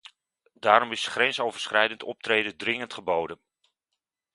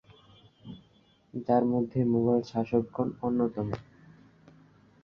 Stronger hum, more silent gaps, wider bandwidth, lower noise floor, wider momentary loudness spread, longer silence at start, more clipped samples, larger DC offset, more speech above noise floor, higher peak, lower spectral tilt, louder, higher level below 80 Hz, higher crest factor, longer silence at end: neither; neither; first, 11.5 kHz vs 6.6 kHz; first, -85 dBFS vs -63 dBFS; second, 9 LU vs 22 LU; about the same, 0.65 s vs 0.65 s; neither; neither; first, 59 dB vs 36 dB; first, -2 dBFS vs -12 dBFS; second, -2.5 dB/octave vs -9.5 dB/octave; first, -25 LUFS vs -29 LUFS; second, -70 dBFS vs -62 dBFS; first, 26 dB vs 20 dB; second, 1 s vs 1.2 s